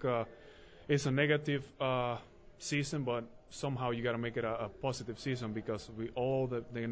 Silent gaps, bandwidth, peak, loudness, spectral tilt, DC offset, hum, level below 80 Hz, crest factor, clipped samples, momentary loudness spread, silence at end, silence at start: none; 8 kHz; -18 dBFS; -36 LUFS; -5.5 dB/octave; under 0.1%; none; -62 dBFS; 18 dB; under 0.1%; 10 LU; 0 s; 0 s